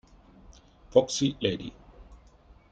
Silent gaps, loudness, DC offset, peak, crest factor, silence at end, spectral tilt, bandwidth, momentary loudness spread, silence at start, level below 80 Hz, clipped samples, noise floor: none; -27 LUFS; under 0.1%; -6 dBFS; 24 dB; 0.55 s; -4.5 dB/octave; 9.2 kHz; 13 LU; 0.5 s; -54 dBFS; under 0.1%; -56 dBFS